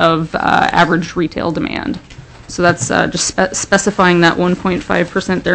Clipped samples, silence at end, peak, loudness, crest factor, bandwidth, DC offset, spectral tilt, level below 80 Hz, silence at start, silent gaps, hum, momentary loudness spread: under 0.1%; 0 s; 0 dBFS; -14 LUFS; 14 dB; 8.6 kHz; under 0.1%; -4.5 dB/octave; -40 dBFS; 0 s; none; none; 8 LU